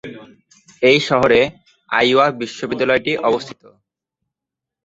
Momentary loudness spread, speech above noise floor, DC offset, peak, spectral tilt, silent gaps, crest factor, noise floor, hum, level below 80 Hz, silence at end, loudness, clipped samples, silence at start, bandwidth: 11 LU; 69 dB; under 0.1%; -2 dBFS; -4.5 dB/octave; none; 18 dB; -85 dBFS; none; -54 dBFS; 1.35 s; -16 LUFS; under 0.1%; 0.05 s; 8 kHz